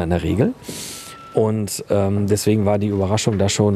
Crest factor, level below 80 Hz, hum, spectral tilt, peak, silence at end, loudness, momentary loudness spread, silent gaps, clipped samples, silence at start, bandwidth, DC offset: 16 dB; -42 dBFS; none; -5.5 dB/octave; -2 dBFS; 0 s; -20 LUFS; 12 LU; none; under 0.1%; 0 s; 14 kHz; under 0.1%